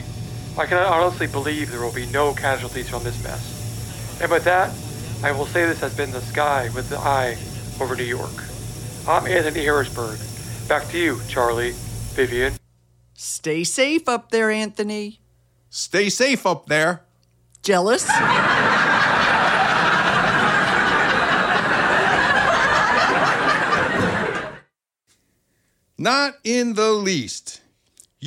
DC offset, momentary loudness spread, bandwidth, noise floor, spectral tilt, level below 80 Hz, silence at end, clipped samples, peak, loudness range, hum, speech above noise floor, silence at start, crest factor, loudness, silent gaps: under 0.1%; 14 LU; 17 kHz; -67 dBFS; -3.5 dB/octave; -44 dBFS; 0 s; under 0.1%; -4 dBFS; 7 LU; none; 46 dB; 0 s; 16 dB; -19 LUFS; none